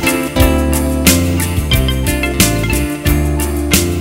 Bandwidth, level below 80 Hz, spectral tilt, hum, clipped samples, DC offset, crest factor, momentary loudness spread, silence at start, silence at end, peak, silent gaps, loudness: 16.5 kHz; -18 dBFS; -4.5 dB/octave; none; under 0.1%; under 0.1%; 14 dB; 5 LU; 0 s; 0 s; 0 dBFS; none; -13 LUFS